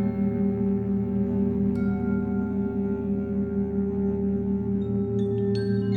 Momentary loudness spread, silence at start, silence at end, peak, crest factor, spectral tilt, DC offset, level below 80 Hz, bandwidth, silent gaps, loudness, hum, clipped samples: 2 LU; 0 s; 0 s; -14 dBFS; 12 dB; -11 dB/octave; under 0.1%; -42 dBFS; 4.7 kHz; none; -26 LUFS; none; under 0.1%